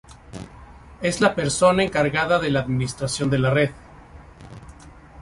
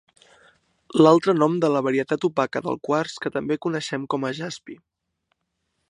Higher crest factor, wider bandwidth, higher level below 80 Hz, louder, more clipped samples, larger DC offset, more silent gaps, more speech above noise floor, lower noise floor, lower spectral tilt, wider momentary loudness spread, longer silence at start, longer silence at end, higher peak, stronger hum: about the same, 20 dB vs 22 dB; about the same, 11.5 kHz vs 11 kHz; first, -46 dBFS vs -68 dBFS; about the same, -21 LUFS vs -22 LUFS; neither; neither; neither; second, 24 dB vs 54 dB; second, -44 dBFS vs -76 dBFS; about the same, -5 dB/octave vs -6 dB/octave; first, 23 LU vs 12 LU; second, 0.1 s vs 0.9 s; second, 0 s vs 1.15 s; about the same, -4 dBFS vs -2 dBFS; neither